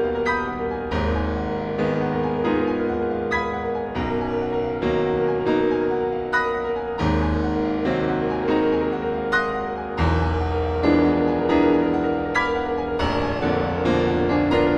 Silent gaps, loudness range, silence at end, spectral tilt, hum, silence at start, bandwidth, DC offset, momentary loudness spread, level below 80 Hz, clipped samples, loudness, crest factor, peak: none; 3 LU; 0 s; -7.5 dB/octave; none; 0 s; 8.2 kHz; under 0.1%; 6 LU; -36 dBFS; under 0.1%; -22 LUFS; 16 dB; -6 dBFS